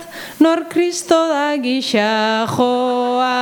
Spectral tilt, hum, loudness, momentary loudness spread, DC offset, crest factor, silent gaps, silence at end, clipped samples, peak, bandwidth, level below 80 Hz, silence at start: -4 dB/octave; none; -16 LUFS; 4 LU; under 0.1%; 16 dB; none; 0 s; under 0.1%; 0 dBFS; 19 kHz; -62 dBFS; 0 s